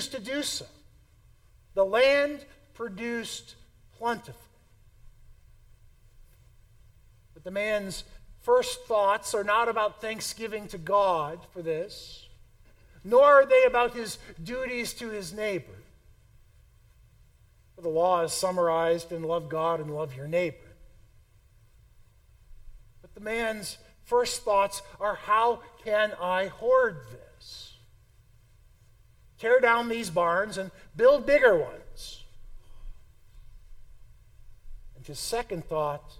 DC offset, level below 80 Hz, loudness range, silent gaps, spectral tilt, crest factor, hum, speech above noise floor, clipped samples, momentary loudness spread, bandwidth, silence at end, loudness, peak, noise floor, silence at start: under 0.1%; -54 dBFS; 14 LU; none; -3.5 dB/octave; 22 dB; none; 33 dB; under 0.1%; 19 LU; 16 kHz; 0.05 s; -26 LUFS; -8 dBFS; -59 dBFS; 0 s